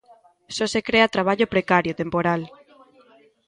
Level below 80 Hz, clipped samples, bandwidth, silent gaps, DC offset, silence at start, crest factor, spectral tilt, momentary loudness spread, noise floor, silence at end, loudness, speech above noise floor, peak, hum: -56 dBFS; under 0.1%; 11.5 kHz; none; under 0.1%; 0.5 s; 20 dB; -5 dB/octave; 9 LU; -55 dBFS; 1 s; -21 LUFS; 34 dB; -2 dBFS; none